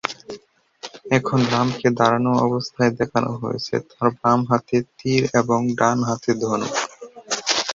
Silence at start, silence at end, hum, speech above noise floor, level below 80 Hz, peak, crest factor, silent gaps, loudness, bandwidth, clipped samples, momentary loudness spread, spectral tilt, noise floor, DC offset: 0.05 s; 0 s; none; 25 dB; -56 dBFS; -2 dBFS; 20 dB; none; -21 LUFS; 7.8 kHz; under 0.1%; 13 LU; -5 dB/octave; -45 dBFS; under 0.1%